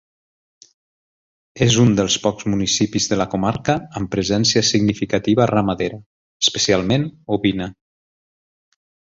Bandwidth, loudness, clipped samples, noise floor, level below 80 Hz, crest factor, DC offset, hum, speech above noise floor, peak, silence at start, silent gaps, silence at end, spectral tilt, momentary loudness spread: 7.8 kHz; -18 LUFS; under 0.1%; under -90 dBFS; -46 dBFS; 18 dB; under 0.1%; none; over 72 dB; -2 dBFS; 1.55 s; 6.06-6.40 s; 1.45 s; -4.5 dB/octave; 8 LU